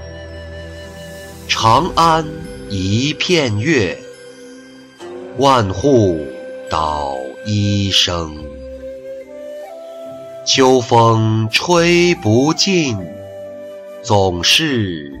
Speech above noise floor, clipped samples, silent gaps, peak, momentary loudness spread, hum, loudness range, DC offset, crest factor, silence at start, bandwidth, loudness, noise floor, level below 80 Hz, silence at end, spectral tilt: 24 dB; under 0.1%; none; -2 dBFS; 20 LU; none; 6 LU; under 0.1%; 14 dB; 0 s; 15.5 kHz; -14 LUFS; -39 dBFS; -40 dBFS; 0 s; -4.5 dB/octave